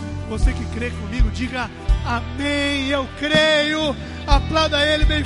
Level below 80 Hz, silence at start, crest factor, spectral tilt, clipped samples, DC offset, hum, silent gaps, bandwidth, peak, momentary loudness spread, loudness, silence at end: -24 dBFS; 0 s; 18 dB; -5 dB/octave; under 0.1%; under 0.1%; none; none; 11.5 kHz; 0 dBFS; 10 LU; -20 LUFS; 0 s